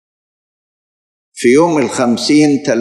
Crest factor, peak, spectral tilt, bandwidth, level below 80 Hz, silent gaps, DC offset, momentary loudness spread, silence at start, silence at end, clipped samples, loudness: 14 dB; 0 dBFS; -4.5 dB/octave; 12 kHz; -64 dBFS; none; under 0.1%; 4 LU; 1.35 s; 0 s; under 0.1%; -12 LUFS